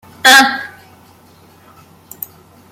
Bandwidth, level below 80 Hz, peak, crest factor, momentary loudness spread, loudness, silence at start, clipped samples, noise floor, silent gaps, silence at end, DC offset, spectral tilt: 17 kHz; -62 dBFS; 0 dBFS; 16 dB; 23 LU; -8 LUFS; 0.25 s; under 0.1%; -45 dBFS; none; 2.05 s; under 0.1%; 0 dB/octave